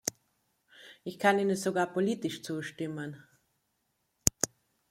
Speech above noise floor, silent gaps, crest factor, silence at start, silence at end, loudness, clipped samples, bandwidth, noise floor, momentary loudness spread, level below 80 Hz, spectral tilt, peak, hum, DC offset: 47 dB; none; 32 dB; 0.05 s; 0.45 s; -31 LUFS; under 0.1%; 16.5 kHz; -78 dBFS; 16 LU; -58 dBFS; -3.5 dB/octave; 0 dBFS; none; under 0.1%